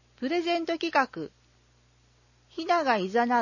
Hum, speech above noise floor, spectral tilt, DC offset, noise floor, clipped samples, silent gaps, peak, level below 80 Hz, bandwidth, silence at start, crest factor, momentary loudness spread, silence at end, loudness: 60 Hz at -65 dBFS; 36 dB; -4.5 dB/octave; under 0.1%; -63 dBFS; under 0.1%; none; -10 dBFS; -68 dBFS; 7.4 kHz; 0.2 s; 20 dB; 15 LU; 0 s; -27 LUFS